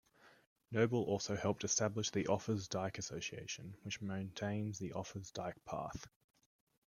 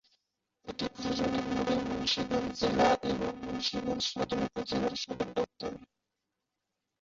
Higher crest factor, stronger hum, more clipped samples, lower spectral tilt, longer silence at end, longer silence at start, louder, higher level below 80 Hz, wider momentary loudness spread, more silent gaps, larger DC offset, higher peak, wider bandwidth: about the same, 22 dB vs 18 dB; neither; neither; about the same, -4.5 dB/octave vs -4.5 dB/octave; second, 0.8 s vs 1.15 s; second, 0.25 s vs 0.65 s; second, -40 LUFS vs -32 LUFS; second, -70 dBFS vs -56 dBFS; about the same, 11 LU vs 11 LU; first, 0.47-0.56 s vs none; neither; second, -18 dBFS vs -14 dBFS; first, 14 kHz vs 7.8 kHz